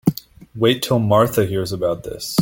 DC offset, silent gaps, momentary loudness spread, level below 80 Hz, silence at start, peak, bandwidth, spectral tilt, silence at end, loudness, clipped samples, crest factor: under 0.1%; none; 8 LU; -48 dBFS; 0.05 s; -2 dBFS; 17 kHz; -5.5 dB/octave; 0 s; -19 LUFS; under 0.1%; 16 dB